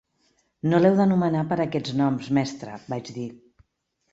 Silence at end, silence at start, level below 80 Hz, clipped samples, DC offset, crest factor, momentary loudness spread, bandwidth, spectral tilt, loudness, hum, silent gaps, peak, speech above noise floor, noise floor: 0.75 s; 0.65 s; -62 dBFS; under 0.1%; under 0.1%; 18 dB; 16 LU; 8 kHz; -7.5 dB/octave; -23 LUFS; none; none; -6 dBFS; 52 dB; -75 dBFS